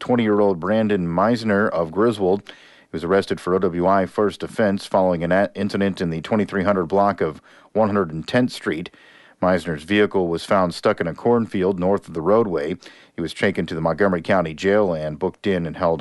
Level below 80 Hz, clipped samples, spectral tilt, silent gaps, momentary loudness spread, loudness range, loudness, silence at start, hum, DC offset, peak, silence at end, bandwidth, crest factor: -52 dBFS; under 0.1%; -7 dB/octave; none; 7 LU; 2 LU; -21 LUFS; 0 s; none; under 0.1%; -4 dBFS; 0 s; 11.5 kHz; 16 dB